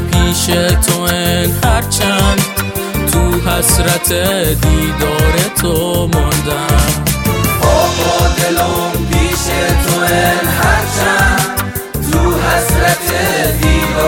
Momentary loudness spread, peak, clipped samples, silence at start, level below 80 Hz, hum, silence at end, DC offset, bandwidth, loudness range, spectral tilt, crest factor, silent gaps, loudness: 3 LU; 0 dBFS; under 0.1%; 0 s; -20 dBFS; none; 0 s; under 0.1%; 17 kHz; 0 LU; -4 dB/octave; 12 dB; none; -12 LUFS